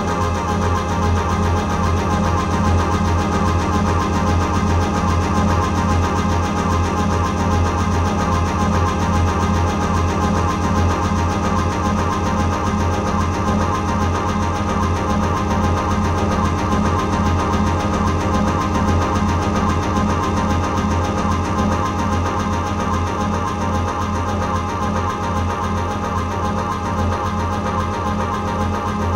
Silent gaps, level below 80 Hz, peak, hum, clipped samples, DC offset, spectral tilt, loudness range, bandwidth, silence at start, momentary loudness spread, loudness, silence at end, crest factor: none; -30 dBFS; -4 dBFS; none; under 0.1%; under 0.1%; -6 dB/octave; 3 LU; 12.5 kHz; 0 s; 3 LU; -19 LUFS; 0 s; 14 dB